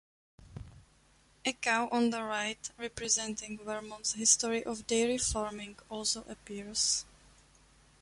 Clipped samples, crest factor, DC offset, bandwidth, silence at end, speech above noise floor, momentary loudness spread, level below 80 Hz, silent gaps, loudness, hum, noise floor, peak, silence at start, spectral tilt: under 0.1%; 22 dB; under 0.1%; 11.5 kHz; 1 s; 32 dB; 17 LU; -56 dBFS; none; -32 LUFS; none; -65 dBFS; -12 dBFS; 0.4 s; -1.5 dB/octave